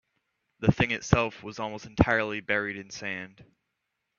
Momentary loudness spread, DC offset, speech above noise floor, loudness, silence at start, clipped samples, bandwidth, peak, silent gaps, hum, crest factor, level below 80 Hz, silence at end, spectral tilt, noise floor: 12 LU; under 0.1%; 53 dB; -28 LUFS; 0.6 s; under 0.1%; 7.2 kHz; -2 dBFS; none; none; 28 dB; -46 dBFS; 0.9 s; -6 dB/octave; -81 dBFS